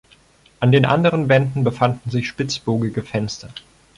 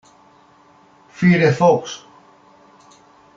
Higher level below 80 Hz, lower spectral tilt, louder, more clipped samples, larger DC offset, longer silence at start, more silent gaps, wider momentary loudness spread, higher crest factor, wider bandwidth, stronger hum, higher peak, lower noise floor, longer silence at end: first, -52 dBFS vs -60 dBFS; about the same, -6.5 dB/octave vs -7 dB/octave; second, -19 LUFS vs -16 LUFS; neither; neither; second, 0.6 s vs 1.2 s; neither; second, 12 LU vs 19 LU; about the same, 16 dB vs 18 dB; first, 11 kHz vs 7.6 kHz; neither; about the same, -2 dBFS vs -2 dBFS; about the same, -53 dBFS vs -51 dBFS; second, 0.4 s vs 1.4 s